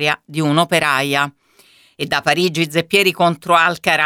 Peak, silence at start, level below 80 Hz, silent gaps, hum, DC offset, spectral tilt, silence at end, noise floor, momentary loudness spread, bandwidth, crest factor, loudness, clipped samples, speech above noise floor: 0 dBFS; 0 s; -60 dBFS; none; none; under 0.1%; -4 dB/octave; 0 s; -51 dBFS; 6 LU; 17.5 kHz; 16 dB; -16 LUFS; under 0.1%; 35 dB